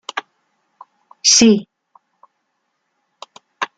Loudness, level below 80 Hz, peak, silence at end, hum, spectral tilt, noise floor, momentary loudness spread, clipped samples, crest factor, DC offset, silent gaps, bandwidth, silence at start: -13 LUFS; -58 dBFS; 0 dBFS; 0.15 s; none; -2 dB/octave; -71 dBFS; 19 LU; under 0.1%; 20 dB; under 0.1%; none; 10 kHz; 0.15 s